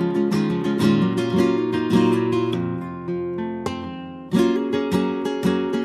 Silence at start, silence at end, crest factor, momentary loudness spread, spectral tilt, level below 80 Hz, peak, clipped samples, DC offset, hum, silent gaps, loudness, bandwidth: 0 s; 0 s; 16 dB; 10 LU; -7 dB/octave; -56 dBFS; -4 dBFS; under 0.1%; under 0.1%; none; none; -22 LUFS; 14 kHz